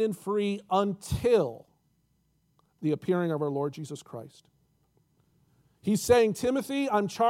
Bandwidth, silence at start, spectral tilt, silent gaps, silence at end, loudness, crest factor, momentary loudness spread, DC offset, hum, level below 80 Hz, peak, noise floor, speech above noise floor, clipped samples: 16.5 kHz; 0 s; -6 dB/octave; none; 0 s; -28 LUFS; 20 dB; 17 LU; under 0.1%; none; -56 dBFS; -10 dBFS; -71 dBFS; 44 dB; under 0.1%